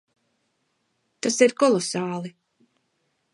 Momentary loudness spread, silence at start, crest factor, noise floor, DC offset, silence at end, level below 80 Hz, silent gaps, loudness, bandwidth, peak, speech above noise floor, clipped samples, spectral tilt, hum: 14 LU; 1.25 s; 22 dB; -73 dBFS; under 0.1%; 1.05 s; -76 dBFS; none; -22 LUFS; 11.5 kHz; -4 dBFS; 51 dB; under 0.1%; -4 dB/octave; none